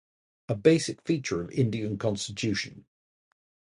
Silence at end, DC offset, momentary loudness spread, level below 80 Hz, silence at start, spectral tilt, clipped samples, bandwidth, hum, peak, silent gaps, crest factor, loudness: 0.9 s; under 0.1%; 9 LU; -58 dBFS; 0.5 s; -5.5 dB/octave; under 0.1%; 11.5 kHz; none; -6 dBFS; none; 22 dB; -28 LUFS